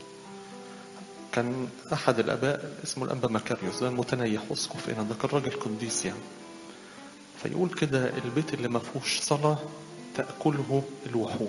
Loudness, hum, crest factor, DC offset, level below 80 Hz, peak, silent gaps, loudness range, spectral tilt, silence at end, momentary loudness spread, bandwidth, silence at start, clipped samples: -30 LUFS; none; 24 dB; under 0.1%; -66 dBFS; -8 dBFS; none; 3 LU; -4.5 dB/octave; 0 s; 18 LU; 11.5 kHz; 0 s; under 0.1%